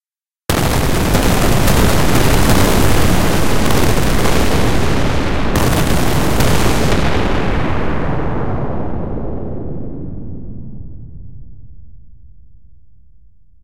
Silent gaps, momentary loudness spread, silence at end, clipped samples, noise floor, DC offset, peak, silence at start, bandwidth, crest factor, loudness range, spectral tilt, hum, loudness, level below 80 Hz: none; 16 LU; 0 s; under 0.1%; -49 dBFS; 10%; 0 dBFS; 0 s; 16.5 kHz; 14 dB; 16 LU; -5 dB/octave; none; -15 LUFS; -22 dBFS